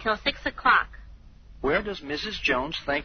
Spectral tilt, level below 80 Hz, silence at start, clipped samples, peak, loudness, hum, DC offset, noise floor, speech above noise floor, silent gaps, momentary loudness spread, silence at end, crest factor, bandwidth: -1 dB/octave; -46 dBFS; 0 s; under 0.1%; -8 dBFS; -26 LUFS; none; under 0.1%; -47 dBFS; 21 dB; none; 10 LU; 0 s; 20 dB; 6.6 kHz